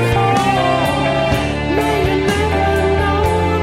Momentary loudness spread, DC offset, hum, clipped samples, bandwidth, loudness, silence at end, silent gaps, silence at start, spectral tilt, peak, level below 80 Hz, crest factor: 3 LU; under 0.1%; none; under 0.1%; 16 kHz; -15 LUFS; 0 s; none; 0 s; -6 dB/octave; -4 dBFS; -28 dBFS; 12 dB